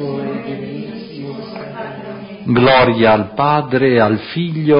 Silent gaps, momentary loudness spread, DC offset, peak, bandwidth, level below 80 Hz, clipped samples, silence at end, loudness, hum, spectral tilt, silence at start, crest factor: none; 18 LU; under 0.1%; -2 dBFS; 5.4 kHz; -48 dBFS; under 0.1%; 0 s; -14 LUFS; none; -11.5 dB/octave; 0 s; 14 dB